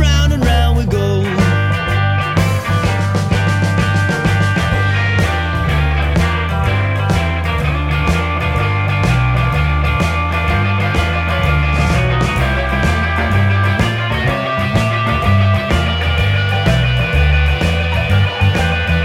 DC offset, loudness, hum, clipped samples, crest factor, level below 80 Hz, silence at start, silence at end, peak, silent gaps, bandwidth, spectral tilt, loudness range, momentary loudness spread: under 0.1%; -15 LUFS; none; under 0.1%; 12 dB; -20 dBFS; 0 s; 0 s; 0 dBFS; none; 14.5 kHz; -6 dB/octave; 1 LU; 3 LU